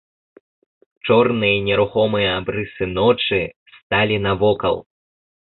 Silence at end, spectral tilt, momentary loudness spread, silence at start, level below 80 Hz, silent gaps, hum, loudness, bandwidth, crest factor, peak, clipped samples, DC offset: 0.6 s; -10.5 dB/octave; 8 LU; 1.05 s; -46 dBFS; 3.56-3.66 s, 3.83-3.90 s; none; -18 LUFS; 4.3 kHz; 18 dB; -2 dBFS; under 0.1%; under 0.1%